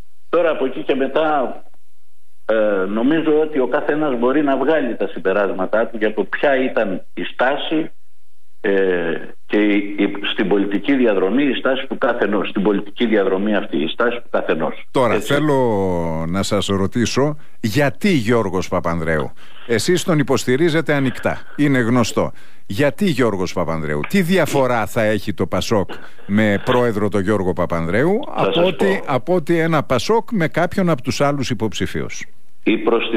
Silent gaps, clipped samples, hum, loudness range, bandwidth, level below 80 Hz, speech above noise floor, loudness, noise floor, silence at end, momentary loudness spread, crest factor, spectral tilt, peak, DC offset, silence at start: none; under 0.1%; none; 2 LU; 15.5 kHz; -48 dBFS; 48 dB; -18 LUFS; -65 dBFS; 0 s; 6 LU; 12 dB; -5.5 dB/octave; -6 dBFS; 5%; 0.3 s